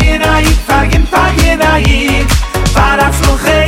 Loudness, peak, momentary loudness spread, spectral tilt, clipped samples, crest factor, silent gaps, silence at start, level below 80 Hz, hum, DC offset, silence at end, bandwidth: -10 LUFS; 0 dBFS; 3 LU; -4.5 dB/octave; under 0.1%; 8 dB; none; 0 s; -12 dBFS; none; under 0.1%; 0 s; 16.5 kHz